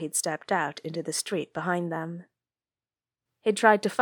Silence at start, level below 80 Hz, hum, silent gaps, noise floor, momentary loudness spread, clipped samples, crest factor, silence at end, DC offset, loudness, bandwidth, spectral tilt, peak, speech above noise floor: 0 s; -80 dBFS; none; none; under -90 dBFS; 13 LU; under 0.1%; 24 dB; 0 s; under 0.1%; -27 LUFS; 19 kHz; -3.5 dB/octave; -4 dBFS; over 63 dB